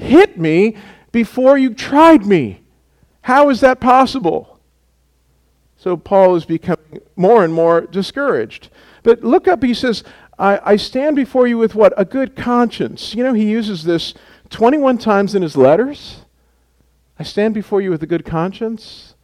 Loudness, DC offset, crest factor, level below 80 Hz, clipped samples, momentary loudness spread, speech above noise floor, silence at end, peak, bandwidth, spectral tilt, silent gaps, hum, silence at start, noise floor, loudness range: -14 LUFS; under 0.1%; 14 dB; -48 dBFS; under 0.1%; 12 LU; 44 dB; 0.3 s; 0 dBFS; 13.5 kHz; -6.5 dB/octave; none; none; 0 s; -58 dBFS; 4 LU